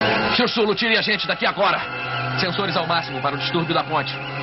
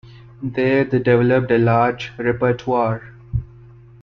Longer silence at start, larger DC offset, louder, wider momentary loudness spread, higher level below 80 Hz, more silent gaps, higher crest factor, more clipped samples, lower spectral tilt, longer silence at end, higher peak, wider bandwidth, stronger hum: about the same, 0 s vs 0.05 s; neither; about the same, -20 LUFS vs -18 LUFS; second, 6 LU vs 12 LU; second, -54 dBFS vs -42 dBFS; neither; about the same, 16 dB vs 16 dB; neither; second, -2 dB/octave vs -8.5 dB/octave; second, 0 s vs 0.55 s; about the same, -6 dBFS vs -4 dBFS; about the same, 6 kHz vs 6.6 kHz; neither